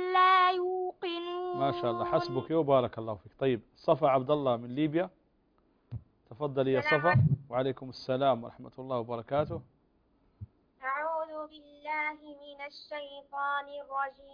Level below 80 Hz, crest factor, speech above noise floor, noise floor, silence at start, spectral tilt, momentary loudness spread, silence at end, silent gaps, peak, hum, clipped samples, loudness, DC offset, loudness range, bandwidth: -64 dBFS; 20 dB; 39 dB; -70 dBFS; 0 s; -8 dB/octave; 18 LU; 0 s; none; -10 dBFS; none; under 0.1%; -30 LUFS; under 0.1%; 8 LU; 5.2 kHz